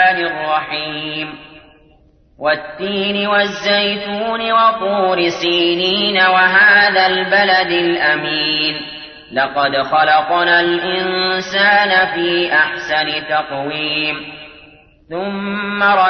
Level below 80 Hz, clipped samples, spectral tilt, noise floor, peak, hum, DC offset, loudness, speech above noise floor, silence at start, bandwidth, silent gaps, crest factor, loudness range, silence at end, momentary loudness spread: -54 dBFS; under 0.1%; -4.5 dB/octave; -50 dBFS; -2 dBFS; none; under 0.1%; -14 LUFS; 35 dB; 0 s; 6.6 kHz; none; 14 dB; 7 LU; 0 s; 11 LU